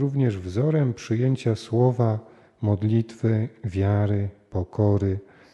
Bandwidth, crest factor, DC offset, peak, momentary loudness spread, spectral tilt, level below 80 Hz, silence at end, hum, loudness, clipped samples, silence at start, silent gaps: 8.8 kHz; 16 dB; under 0.1%; -8 dBFS; 8 LU; -9 dB/octave; -54 dBFS; 0.35 s; none; -24 LUFS; under 0.1%; 0 s; none